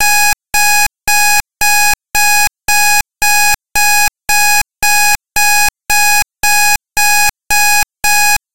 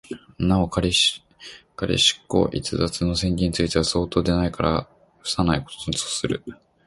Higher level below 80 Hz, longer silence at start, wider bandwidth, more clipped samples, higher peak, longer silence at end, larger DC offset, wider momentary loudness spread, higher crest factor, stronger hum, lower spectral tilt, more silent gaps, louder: about the same, -34 dBFS vs -38 dBFS; about the same, 0 s vs 0.1 s; first, over 20 kHz vs 11.5 kHz; first, 0.4% vs under 0.1%; first, 0 dBFS vs -4 dBFS; second, 0 s vs 0.35 s; first, 10% vs under 0.1%; second, 2 LU vs 14 LU; second, 10 dB vs 18 dB; neither; second, 2 dB/octave vs -4.5 dB/octave; neither; first, -10 LUFS vs -22 LUFS